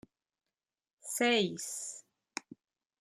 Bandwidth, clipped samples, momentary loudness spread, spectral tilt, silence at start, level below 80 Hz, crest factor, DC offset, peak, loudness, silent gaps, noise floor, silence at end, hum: 15.5 kHz; under 0.1%; 18 LU; -2.5 dB/octave; 1.05 s; -82 dBFS; 22 dB; under 0.1%; -16 dBFS; -33 LUFS; none; under -90 dBFS; 0.6 s; none